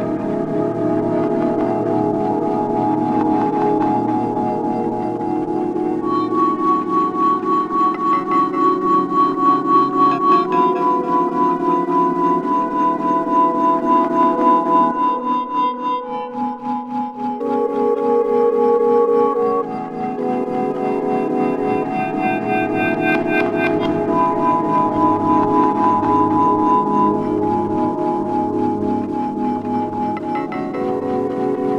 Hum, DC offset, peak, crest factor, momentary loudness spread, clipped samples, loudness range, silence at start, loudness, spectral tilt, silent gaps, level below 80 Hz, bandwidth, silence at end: none; under 0.1%; -2 dBFS; 14 dB; 7 LU; under 0.1%; 4 LU; 0 s; -18 LUFS; -8 dB/octave; none; -54 dBFS; 8.8 kHz; 0 s